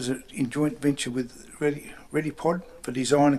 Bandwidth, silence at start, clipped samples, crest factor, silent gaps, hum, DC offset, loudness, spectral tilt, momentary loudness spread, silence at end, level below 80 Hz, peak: 13 kHz; 0 s; under 0.1%; 20 dB; none; none; under 0.1%; -28 LUFS; -5.5 dB/octave; 8 LU; 0 s; -58 dBFS; -6 dBFS